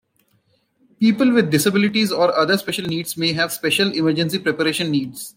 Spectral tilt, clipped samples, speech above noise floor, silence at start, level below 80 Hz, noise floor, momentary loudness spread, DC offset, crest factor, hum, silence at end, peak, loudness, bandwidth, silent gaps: -4.5 dB/octave; under 0.1%; 45 dB; 1 s; -62 dBFS; -63 dBFS; 6 LU; under 0.1%; 16 dB; none; 0.05 s; -2 dBFS; -18 LUFS; 16.5 kHz; none